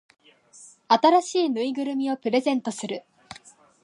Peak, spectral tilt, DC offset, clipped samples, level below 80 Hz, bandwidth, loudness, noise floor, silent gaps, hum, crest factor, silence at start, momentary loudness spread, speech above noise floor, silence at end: -6 dBFS; -4 dB/octave; under 0.1%; under 0.1%; -74 dBFS; 11.5 kHz; -23 LUFS; -52 dBFS; none; none; 20 dB; 0.6 s; 26 LU; 29 dB; 0.85 s